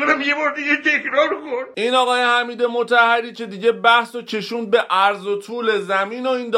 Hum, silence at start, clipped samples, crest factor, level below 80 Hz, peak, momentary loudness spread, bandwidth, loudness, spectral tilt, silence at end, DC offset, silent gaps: none; 0 s; under 0.1%; 16 dB; -70 dBFS; -2 dBFS; 10 LU; 13 kHz; -18 LUFS; -3.5 dB/octave; 0 s; under 0.1%; none